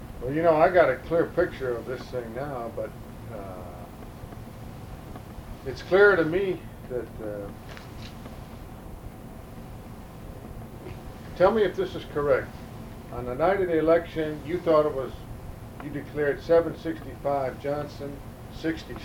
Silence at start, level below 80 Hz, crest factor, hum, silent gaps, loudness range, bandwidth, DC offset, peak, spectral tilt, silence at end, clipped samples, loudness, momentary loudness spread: 0 s; -46 dBFS; 22 dB; none; none; 14 LU; 17.5 kHz; under 0.1%; -6 dBFS; -7 dB/octave; 0 s; under 0.1%; -26 LUFS; 21 LU